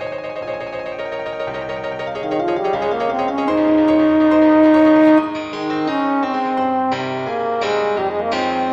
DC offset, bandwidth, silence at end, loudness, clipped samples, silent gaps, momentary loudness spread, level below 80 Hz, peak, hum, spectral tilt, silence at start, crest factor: under 0.1%; 7.2 kHz; 0 s; -17 LUFS; under 0.1%; none; 14 LU; -50 dBFS; -2 dBFS; none; -6.5 dB/octave; 0 s; 14 dB